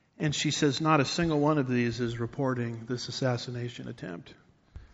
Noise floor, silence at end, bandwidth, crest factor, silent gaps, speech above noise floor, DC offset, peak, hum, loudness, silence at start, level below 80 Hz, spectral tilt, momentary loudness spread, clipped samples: -51 dBFS; 0.1 s; 8 kHz; 20 dB; none; 22 dB; under 0.1%; -10 dBFS; none; -29 LUFS; 0.2 s; -56 dBFS; -5 dB/octave; 14 LU; under 0.1%